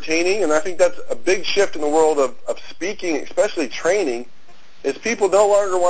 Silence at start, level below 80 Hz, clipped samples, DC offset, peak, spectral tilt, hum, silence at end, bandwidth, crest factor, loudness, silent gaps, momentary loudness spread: 0 s; -58 dBFS; under 0.1%; 4%; -4 dBFS; -3 dB/octave; none; 0 s; 8 kHz; 16 dB; -19 LUFS; none; 11 LU